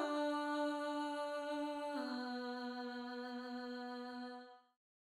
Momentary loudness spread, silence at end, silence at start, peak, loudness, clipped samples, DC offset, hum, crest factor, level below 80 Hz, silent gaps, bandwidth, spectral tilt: 9 LU; 0.5 s; 0 s; -28 dBFS; -43 LUFS; under 0.1%; under 0.1%; none; 14 dB; -86 dBFS; none; 15.5 kHz; -3 dB/octave